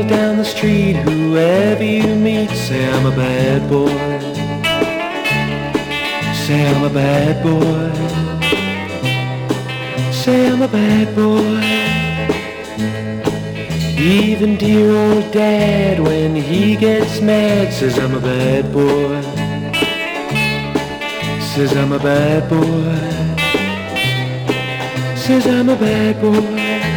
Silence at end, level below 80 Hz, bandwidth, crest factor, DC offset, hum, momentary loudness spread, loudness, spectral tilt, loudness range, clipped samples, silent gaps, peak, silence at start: 0 s; -40 dBFS; 20 kHz; 12 dB; under 0.1%; none; 7 LU; -15 LUFS; -6 dB/octave; 3 LU; under 0.1%; none; -2 dBFS; 0 s